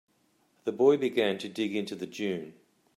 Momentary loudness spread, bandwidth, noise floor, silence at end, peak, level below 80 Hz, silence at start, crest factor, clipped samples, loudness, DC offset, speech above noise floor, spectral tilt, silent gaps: 13 LU; 13.5 kHz; -69 dBFS; 0.45 s; -12 dBFS; -80 dBFS; 0.65 s; 20 dB; under 0.1%; -29 LUFS; under 0.1%; 41 dB; -5.5 dB/octave; none